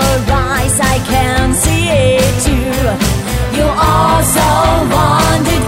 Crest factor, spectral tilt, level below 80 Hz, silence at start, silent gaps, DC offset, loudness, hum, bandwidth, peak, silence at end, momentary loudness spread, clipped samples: 12 dB; -4.5 dB/octave; -20 dBFS; 0 s; none; under 0.1%; -11 LUFS; none; 16.5 kHz; 0 dBFS; 0 s; 4 LU; under 0.1%